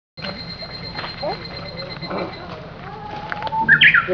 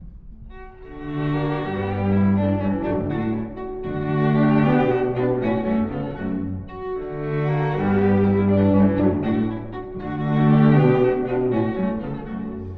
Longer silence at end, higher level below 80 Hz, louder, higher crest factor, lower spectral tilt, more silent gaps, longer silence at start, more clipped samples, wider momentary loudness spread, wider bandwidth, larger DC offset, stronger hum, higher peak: about the same, 0 s vs 0 s; about the same, -46 dBFS vs -42 dBFS; about the same, -19 LUFS vs -21 LUFS; about the same, 20 dB vs 16 dB; second, -5.5 dB/octave vs -11 dB/octave; neither; first, 0.15 s vs 0 s; neither; first, 22 LU vs 13 LU; first, 5.4 kHz vs 4.7 kHz; neither; neither; first, 0 dBFS vs -4 dBFS